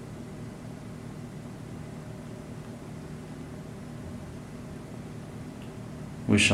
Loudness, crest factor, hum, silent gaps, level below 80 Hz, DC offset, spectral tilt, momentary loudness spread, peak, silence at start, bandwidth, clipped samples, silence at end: -37 LUFS; 24 dB; none; none; -54 dBFS; under 0.1%; -4 dB/octave; 1 LU; -10 dBFS; 0 s; 15 kHz; under 0.1%; 0 s